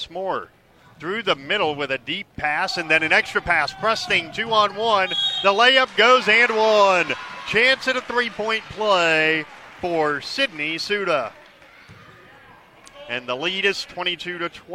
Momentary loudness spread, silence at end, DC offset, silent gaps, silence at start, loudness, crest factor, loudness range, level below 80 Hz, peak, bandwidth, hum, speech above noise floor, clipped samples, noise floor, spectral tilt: 13 LU; 0 s; under 0.1%; none; 0 s; -19 LUFS; 20 dB; 10 LU; -56 dBFS; -2 dBFS; 14.5 kHz; none; 28 dB; under 0.1%; -48 dBFS; -3 dB/octave